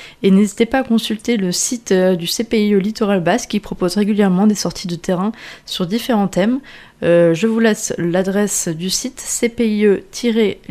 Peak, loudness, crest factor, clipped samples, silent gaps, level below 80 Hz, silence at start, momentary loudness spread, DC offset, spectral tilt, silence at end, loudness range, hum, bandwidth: 0 dBFS; -16 LUFS; 16 dB; under 0.1%; none; -48 dBFS; 0 s; 7 LU; under 0.1%; -4.5 dB/octave; 0.15 s; 2 LU; none; 15.5 kHz